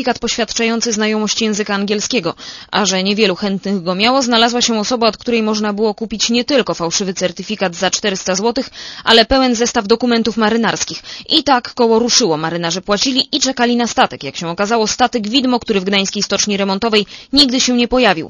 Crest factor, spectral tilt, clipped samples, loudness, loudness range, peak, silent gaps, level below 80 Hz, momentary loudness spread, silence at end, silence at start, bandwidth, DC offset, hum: 16 dB; -3 dB/octave; under 0.1%; -14 LUFS; 2 LU; 0 dBFS; none; -44 dBFS; 8 LU; 0 s; 0 s; 11 kHz; under 0.1%; none